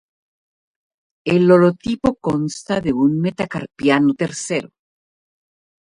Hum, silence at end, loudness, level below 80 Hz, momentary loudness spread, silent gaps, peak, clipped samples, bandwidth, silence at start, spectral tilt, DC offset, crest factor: none; 1.2 s; -18 LUFS; -52 dBFS; 11 LU; none; 0 dBFS; under 0.1%; 11 kHz; 1.25 s; -6 dB/octave; under 0.1%; 18 dB